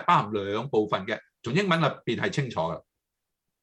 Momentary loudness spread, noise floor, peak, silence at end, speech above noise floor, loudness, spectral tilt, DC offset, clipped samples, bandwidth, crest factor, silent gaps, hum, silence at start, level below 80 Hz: 10 LU; -84 dBFS; -6 dBFS; 0.8 s; 58 dB; -27 LUFS; -6 dB/octave; under 0.1%; under 0.1%; 10.5 kHz; 22 dB; none; none; 0 s; -66 dBFS